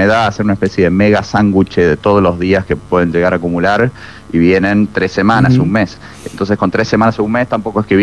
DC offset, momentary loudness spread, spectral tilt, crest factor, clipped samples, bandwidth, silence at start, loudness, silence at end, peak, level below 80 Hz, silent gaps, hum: 0.5%; 6 LU; -7 dB/octave; 12 dB; under 0.1%; 11.5 kHz; 0 s; -12 LUFS; 0 s; 0 dBFS; -38 dBFS; none; none